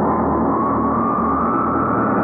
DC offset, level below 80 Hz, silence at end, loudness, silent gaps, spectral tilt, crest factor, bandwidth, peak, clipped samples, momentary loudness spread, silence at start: under 0.1%; -38 dBFS; 0 s; -18 LUFS; none; -12.5 dB/octave; 10 dB; 2.8 kHz; -6 dBFS; under 0.1%; 0 LU; 0 s